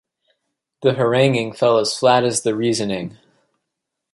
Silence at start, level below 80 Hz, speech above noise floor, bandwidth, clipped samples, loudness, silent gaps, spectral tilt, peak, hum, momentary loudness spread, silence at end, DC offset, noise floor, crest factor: 0.8 s; -62 dBFS; 63 dB; 12 kHz; under 0.1%; -18 LUFS; none; -4.5 dB/octave; -2 dBFS; none; 8 LU; 1.05 s; under 0.1%; -80 dBFS; 18 dB